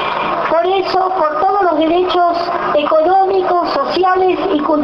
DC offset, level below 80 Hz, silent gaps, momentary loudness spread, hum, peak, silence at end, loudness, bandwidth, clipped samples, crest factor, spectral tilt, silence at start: under 0.1%; -48 dBFS; none; 3 LU; none; -2 dBFS; 0 s; -14 LUFS; 6.4 kHz; under 0.1%; 10 dB; -6 dB/octave; 0 s